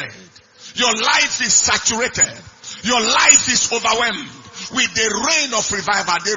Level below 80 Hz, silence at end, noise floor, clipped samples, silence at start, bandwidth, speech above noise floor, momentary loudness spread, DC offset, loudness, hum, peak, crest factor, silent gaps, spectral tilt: -50 dBFS; 0 s; -44 dBFS; under 0.1%; 0 s; 12 kHz; 26 dB; 18 LU; under 0.1%; -15 LUFS; none; 0 dBFS; 18 dB; none; 0 dB/octave